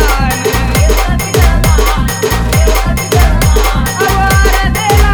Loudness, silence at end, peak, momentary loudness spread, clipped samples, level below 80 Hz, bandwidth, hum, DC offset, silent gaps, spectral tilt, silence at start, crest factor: -11 LUFS; 0 s; 0 dBFS; 3 LU; under 0.1%; -12 dBFS; over 20 kHz; none; under 0.1%; none; -4.5 dB/octave; 0 s; 8 dB